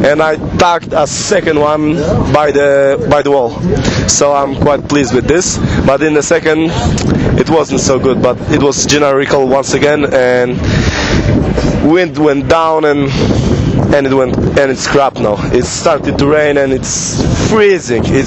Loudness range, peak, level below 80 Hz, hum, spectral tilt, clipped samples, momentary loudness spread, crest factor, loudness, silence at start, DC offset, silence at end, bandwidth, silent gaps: 1 LU; 0 dBFS; -26 dBFS; none; -5 dB/octave; 0.1%; 3 LU; 10 dB; -10 LUFS; 0 s; under 0.1%; 0 s; 8.6 kHz; none